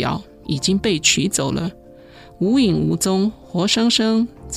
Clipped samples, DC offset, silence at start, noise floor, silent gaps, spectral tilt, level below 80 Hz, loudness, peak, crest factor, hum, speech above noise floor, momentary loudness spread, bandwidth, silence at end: under 0.1%; under 0.1%; 0 s; -43 dBFS; none; -4 dB/octave; -44 dBFS; -18 LUFS; -2 dBFS; 16 dB; none; 25 dB; 9 LU; 15.5 kHz; 0 s